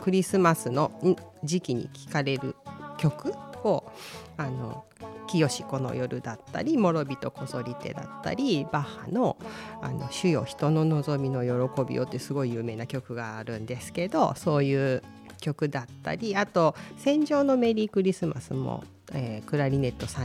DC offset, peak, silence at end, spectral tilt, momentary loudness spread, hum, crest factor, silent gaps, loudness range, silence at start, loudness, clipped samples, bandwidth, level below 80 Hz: under 0.1%; -8 dBFS; 0 s; -6.5 dB/octave; 12 LU; none; 20 dB; none; 5 LU; 0 s; -28 LUFS; under 0.1%; 15 kHz; -60 dBFS